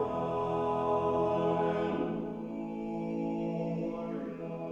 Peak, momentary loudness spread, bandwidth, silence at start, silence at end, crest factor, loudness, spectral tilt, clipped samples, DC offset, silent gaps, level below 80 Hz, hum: -18 dBFS; 9 LU; 8 kHz; 0 s; 0 s; 14 dB; -33 LUFS; -8.5 dB/octave; under 0.1%; under 0.1%; none; -60 dBFS; none